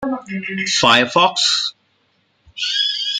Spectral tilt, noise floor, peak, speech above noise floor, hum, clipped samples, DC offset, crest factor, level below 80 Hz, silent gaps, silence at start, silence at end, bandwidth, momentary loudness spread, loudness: -2 dB/octave; -62 dBFS; 0 dBFS; 45 dB; none; under 0.1%; under 0.1%; 18 dB; -58 dBFS; none; 0 s; 0 s; 15.5 kHz; 12 LU; -16 LUFS